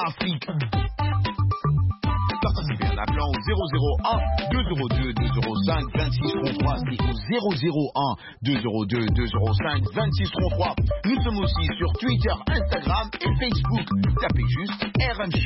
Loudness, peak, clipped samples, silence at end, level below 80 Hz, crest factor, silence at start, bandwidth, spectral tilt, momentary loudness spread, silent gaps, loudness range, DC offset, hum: -24 LUFS; -10 dBFS; under 0.1%; 0 s; -30 dBFS; 12 dB; 0 s; 5.8 kHz; -10.5 dB/octave; 2 LU; none; 1 LU; under 0.1%; none